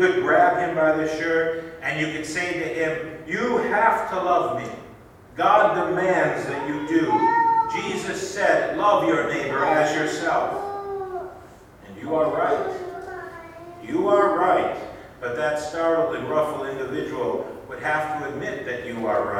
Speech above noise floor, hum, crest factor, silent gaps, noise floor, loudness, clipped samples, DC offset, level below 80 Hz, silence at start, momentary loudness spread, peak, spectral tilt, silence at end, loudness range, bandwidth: 24 dB; none; 20 dB; none; -46 dBFS; -22 LUFS; under 0.1%; under 0.1%; -56 dBFS; 0 s; 14 LU; -4 dBFS; -5 dB/octave; 0 s; 5 LU; 15.5 kHz